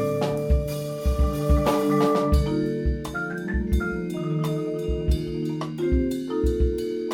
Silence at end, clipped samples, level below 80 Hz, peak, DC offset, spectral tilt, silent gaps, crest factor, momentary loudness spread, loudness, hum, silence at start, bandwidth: 0 s; under 0.1%; -28 dBFS; -8 dBFS; under 0.1%; -7.5 dB/octave; none; 16 dB; 7 LU; -25 LUFS; none; 0 s; 16.5 kHz